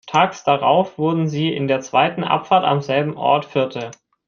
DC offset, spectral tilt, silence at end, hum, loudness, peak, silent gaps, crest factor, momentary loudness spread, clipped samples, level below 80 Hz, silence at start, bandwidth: under 0.1%; -6 dB/octave; 0.35 s; none; -18 LUFS; -2 dBFS; none; 18 dB; 6 LU; under 0.1%; -62 dBFS; 0.05 s; 7.2 kHz